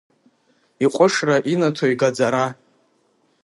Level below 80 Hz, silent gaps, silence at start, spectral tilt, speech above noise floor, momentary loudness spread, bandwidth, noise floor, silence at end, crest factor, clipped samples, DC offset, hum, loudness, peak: -70 dBFS; none; 0.8 s; -5 dB/octave; 45 dB; 6 LU; 11.5 kHz; -63 dBFS; 0.9 s; 20 dB; under 0.1%; under 0.1%; none; -19 LUFS; -2 dBFS